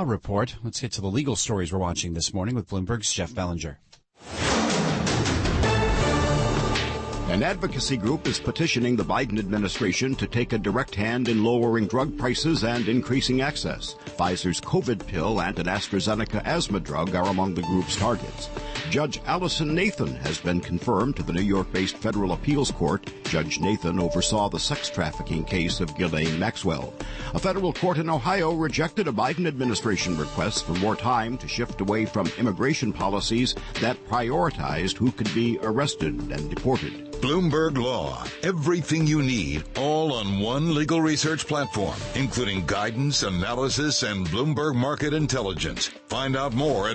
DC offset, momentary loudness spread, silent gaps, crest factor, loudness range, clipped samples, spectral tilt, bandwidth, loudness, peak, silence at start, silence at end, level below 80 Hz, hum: under 0.1%; 6 LU; none; 14 dB; 2 LU; under 0.1%; -5 dB/octave; 8.8 kHz; -25 LUFS; -12 dBFS; 0 s; 0 s; -40 dBFS; none